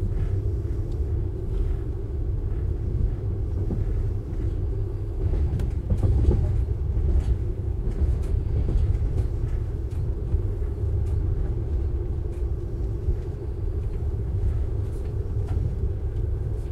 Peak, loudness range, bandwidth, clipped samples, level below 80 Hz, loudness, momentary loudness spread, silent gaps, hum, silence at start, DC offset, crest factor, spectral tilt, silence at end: -6 dBFS; 4 LU; 4.9 kHz; under 0.1%; -26 dBFS; -28 LUFS; 5 LU; none; none; 0 s; under 0.1%; 18 dB; -10 dB/octave; 0 s